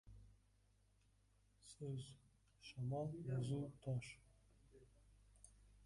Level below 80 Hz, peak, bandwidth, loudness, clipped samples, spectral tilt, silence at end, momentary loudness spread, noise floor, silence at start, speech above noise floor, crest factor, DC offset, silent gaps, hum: -72 dBFS; -34 dBFS; 11.5 kHz; -48 LUFS; under 0.1%; -7 dB/octave; 0 s; 22 LU; -76 dBFS; 0.05 s; 30 dB; 18 dB; under 0.1%; none; 50 Hz at -70 dBFS